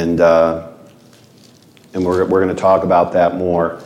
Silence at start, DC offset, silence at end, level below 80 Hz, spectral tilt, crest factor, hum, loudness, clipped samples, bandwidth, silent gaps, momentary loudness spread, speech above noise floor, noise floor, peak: 0 s; under 0.1%; 0 s; -48 dBFS; -7.5 dB/octave; 14 dB; none; -14 LUFS; under 0.1%; 12 kHz; none; 8 LU; 32 dB; -46 dBFS; -2 dBFS